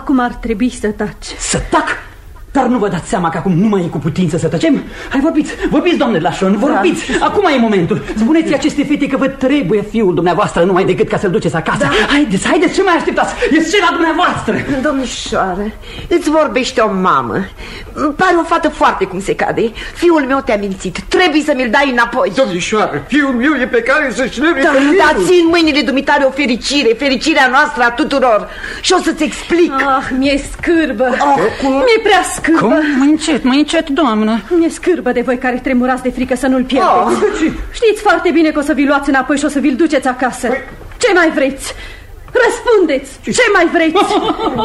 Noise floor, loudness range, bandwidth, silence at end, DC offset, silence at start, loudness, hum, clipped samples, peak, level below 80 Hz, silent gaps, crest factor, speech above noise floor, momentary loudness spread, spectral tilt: -32 dBFS; 3 LU; 13 kHz; 0 s; under 0.1%; 0 s; -13 LUFS; none; under 0.1%; 0 dBFS; -34 dBFS; none; 12 dB; 20 dB; 7 LU; -4.5 dB/octave